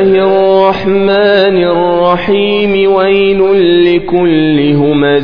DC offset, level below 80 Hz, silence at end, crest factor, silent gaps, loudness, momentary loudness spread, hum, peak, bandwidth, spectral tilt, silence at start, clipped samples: 2%; -40 dBFS; 0 s; 8 dB; none; -9 LUFS; 3 LU; none; 0 dBFS; 5.2 kHz; -8.5 dB/octave; 0 s; 0.2%